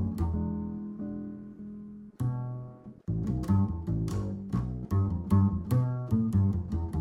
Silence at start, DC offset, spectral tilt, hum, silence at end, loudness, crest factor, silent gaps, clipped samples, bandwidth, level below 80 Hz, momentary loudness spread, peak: 0 s; under 0.1%; -9.5 dB/octave; none; 0 s; -31 LUFS; 18 dB; none; under 0.1%; 13 kHz; -42 dBFS; 17 LU; -12 dBFS